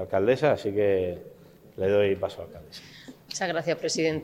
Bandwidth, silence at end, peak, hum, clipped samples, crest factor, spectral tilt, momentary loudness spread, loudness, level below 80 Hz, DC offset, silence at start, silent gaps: 15.5 kHz; 0 s; -10 dBFS; none; under 0.1%; 16 dB; -4.5 dB/octave; 20 LU; -26 LUFS; -64 dBFS; under 0.1%; 0 s; none